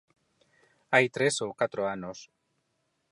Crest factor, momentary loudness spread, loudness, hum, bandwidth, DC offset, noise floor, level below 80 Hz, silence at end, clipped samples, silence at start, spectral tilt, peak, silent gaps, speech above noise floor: 22 dB; 16 LU; -28 LUFS; none; 11.5 kHz; under 0.1%; -77 dBFS; -72 dBFS; 0.85 s; under 0.1%; 0.9 s; -3.5 dB/octave; -8 dBFS; none; 49 dB